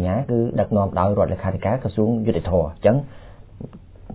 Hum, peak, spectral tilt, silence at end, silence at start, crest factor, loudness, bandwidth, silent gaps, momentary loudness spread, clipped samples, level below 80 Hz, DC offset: none; -4 dBFS; -12.5 dB/octave; 0 s; 0 s; 18 dB; -21 LUFS; 4 kHz; none; 19 LU; under 0.1%; -36 dBFS; under 0.1%